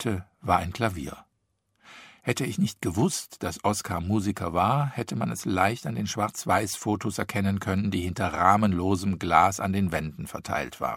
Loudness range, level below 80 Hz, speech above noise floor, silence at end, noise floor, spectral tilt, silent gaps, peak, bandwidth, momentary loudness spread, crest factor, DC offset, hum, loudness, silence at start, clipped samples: 5 LU; -52 dBFS; 48 dB; 0 s; -75 dBFS; -5.5 dB/octave; none; -4 dBFS; 16.5 kHz; 10 LU; 22 dB; under 0.1%; none; -27 LUFS; 0 s; under 0.1%